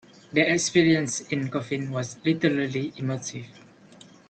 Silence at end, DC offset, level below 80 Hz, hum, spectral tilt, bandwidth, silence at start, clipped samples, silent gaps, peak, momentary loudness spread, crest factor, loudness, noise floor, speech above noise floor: 0.7 s; under 0.1%; -64 dBFS; none; -4.5 dB/octave; 9 kHz; 0.3 s; under 0.1%; none; -6 dBFS; 11 LU; 20 dB; -25 LUFS; -51 dBFS; 26 dB